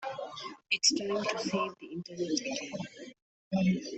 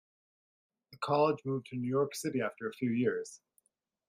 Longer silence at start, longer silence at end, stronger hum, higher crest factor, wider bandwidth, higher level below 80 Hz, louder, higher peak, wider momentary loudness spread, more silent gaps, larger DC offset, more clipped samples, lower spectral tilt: second, 0 s vs 0.9 s; second, 0 s vs 0.7 s; neither; about the same, 22 dB vs 20 dB; second, 8.4 kHz vs 16 kHz; first, -70 dBFS vs -80 dBFS; about the same, -32 LUFS vs -33 LUFS; first, -12 dBFS vs -16 dBFS; first, 17 LU vs 9 LU; first, 3.22-3.51 s vs none; neither; neither; second, -3.5 dB/octave vs -6 dB/octave